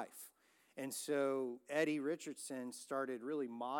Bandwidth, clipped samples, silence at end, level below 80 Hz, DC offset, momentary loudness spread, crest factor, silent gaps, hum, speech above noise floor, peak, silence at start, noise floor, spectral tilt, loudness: 18 kHz; under 0.1%; 0 s; under -90 dBFS; under 0.1%; 13 LU; 18 dB; none; none; 29 dB; -24 dBFS; 0 s; -70 dBFS; -4 dB/octave; -41 LUFS